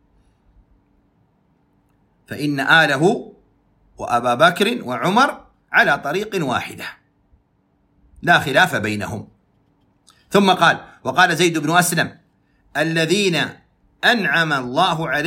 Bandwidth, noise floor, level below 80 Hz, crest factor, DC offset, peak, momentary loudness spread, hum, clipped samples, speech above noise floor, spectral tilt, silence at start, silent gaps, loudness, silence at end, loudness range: 16.5 kHz; -62 dBFS; -56 dBFS; 18 dB; under 0.1%; 0 dBFS; 12 LU; none; under 0.1%; 45 dB; -4 dB/octave; 2.3 s; none; -17 LUFS; 0 s; 3 LU